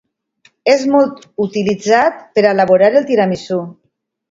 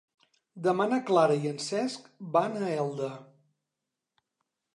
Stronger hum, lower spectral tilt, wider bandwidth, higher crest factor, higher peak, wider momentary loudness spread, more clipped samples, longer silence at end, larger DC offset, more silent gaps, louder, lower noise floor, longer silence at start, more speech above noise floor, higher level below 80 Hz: neither; about the same, -5.5 dB/octave vs -5.5 dB/octave; second, 7.8 kHz vs 11.5 kHz; second, 14 dB vs 20 dB; first, 0 dBFS vs -10 dBFS; about the same, 10 LU vs 12 LU; neither; second, 0.6 s vs 1.5 s; neither; neither; first, -14 LUFS vs -29 LUFS; second, -55 dBFS vs -87 dBFS; about the same, 0.65 s vs 0.55 s; second, 42 dB vs 59 dB; first, -58 dBFS vs -82 dBFS